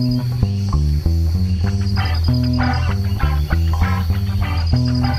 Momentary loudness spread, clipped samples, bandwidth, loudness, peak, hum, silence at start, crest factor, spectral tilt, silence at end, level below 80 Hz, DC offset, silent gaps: 2 LU; under 0.1%; 14.5 kHz; -18 LUFS; -2 dBFS; none; 0 s; 16 dB; -7 dB/octave; 0 s; -22 dBFS; 0.2%; none